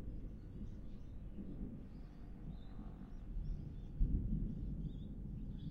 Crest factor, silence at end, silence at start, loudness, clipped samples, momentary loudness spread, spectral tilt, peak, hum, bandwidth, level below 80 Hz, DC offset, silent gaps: 20 dB; 0 s; 0 s; -48 LUFS; under 0.1%; 12 LU; -10 dB/octave; -22 dBFS; none; 4.2 kHz; -46 dBFS; under 0.1%; none